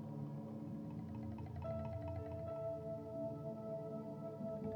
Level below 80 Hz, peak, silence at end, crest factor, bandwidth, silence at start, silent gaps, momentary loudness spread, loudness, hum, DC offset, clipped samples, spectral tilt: -66 dBFS; -34 dBFS; 0 s; 12 dB; over 20 kHz; 0 s; none; 3 LU; -47 LUFS; none; under 0.1%; under 0.1%; -10 dB/octave